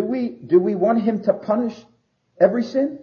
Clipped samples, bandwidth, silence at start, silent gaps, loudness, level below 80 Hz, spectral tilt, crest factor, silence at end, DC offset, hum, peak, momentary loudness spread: under 0.1%; 6.8 kHz; 0 s; none; -20 LUFS; -68 dBFS; -8.5 dB/octave; 18 dB; 0 s; under 0.1%; none; -2 dBFS; 6 LU